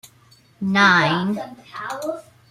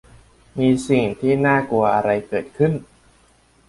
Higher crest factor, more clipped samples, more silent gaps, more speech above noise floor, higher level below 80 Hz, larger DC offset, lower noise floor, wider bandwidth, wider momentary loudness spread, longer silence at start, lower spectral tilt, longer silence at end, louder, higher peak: about the same, 18 dB vs 16 dB; neither; neither; about the same, 34 dB vs 37 dB; second, -62 dBFS vs -50 dBFS; neither; about the same, -54 dBFS vs -56 dBFS; first, 14 kHz vs 11.5 kHz; first, 19 LU vs 8 LU; second, 0.05 s vs 0.55 s; second, -5 dB/octave vs -7 dB/octave; second, 0.3 s vs 0.85 s; about the same, -19 LUFS vs -19 LUFS; about the same, -2 dBFS vs -4 dBFS